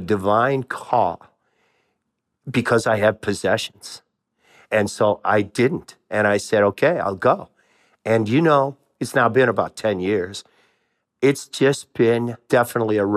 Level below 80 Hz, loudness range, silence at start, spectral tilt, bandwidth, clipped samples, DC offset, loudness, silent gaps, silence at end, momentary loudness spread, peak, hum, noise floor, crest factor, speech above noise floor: -64 dBFS; 3 LU; 0 s; -5.5 dB/octave; 14.5 kHz; under 0.1%; under 0.1%; -20 LUFS; none; 0 s; 11 LU; -4 dBFS; none; -76 dBFS; 18 dB; 57 dB